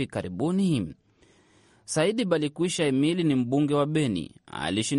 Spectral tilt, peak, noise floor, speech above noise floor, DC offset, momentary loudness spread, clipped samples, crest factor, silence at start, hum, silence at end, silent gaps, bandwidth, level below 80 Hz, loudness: -5.5 dB/octave; -10 dBFS; -60 dBFS; 35 dB; under 0.1%; 8 LU; under 0.1%; 16 dB; 0 s; none; 0 s; none; 11.5 kHz; -60 dBFS; -26 LUFS